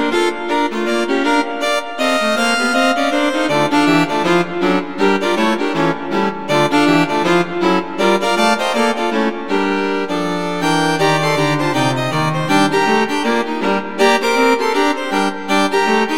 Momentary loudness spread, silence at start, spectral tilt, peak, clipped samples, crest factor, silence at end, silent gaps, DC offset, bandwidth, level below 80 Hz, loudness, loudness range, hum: 5 LU; 0 s; -4.5 dB/octave; 0 dBFS; under 0.1%; 16 dB; 0 s; none; 2%; 17.5 kHz; -52 dBFS; -15 LUFS; 1 LU; none